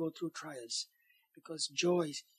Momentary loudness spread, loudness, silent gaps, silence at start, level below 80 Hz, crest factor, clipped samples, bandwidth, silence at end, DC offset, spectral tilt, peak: 14 LU; -37 LUFS; none; 0 s; under -90 dBFS; 18 dB; under 0.1%; 14 kHz; 0.15 s; under 0.1%; -3.5 dB/octave; -20 dBFS